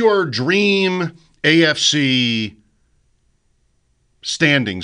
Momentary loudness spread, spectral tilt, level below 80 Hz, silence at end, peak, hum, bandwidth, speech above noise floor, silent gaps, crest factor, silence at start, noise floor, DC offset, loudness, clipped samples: 12 LU; -4 dB/octave; -60 dBFS; 0 s; -2 dBFS; none; 10.5 kHz; 46 dB; none; 16 dB; 0 s; -62 dBFS; under 0.1%; -16 LUFS; under 0.1%